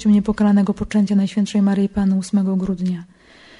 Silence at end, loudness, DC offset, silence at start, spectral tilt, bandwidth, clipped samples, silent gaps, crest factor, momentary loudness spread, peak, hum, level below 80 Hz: 0.55 s; -18 LUFS; under 0.1%; 0 s; -7.5 dB/octave; 11 kHz; under 0.1%; none; 10 dB; 6 LU; -8 dBFS; none; -44 dBFS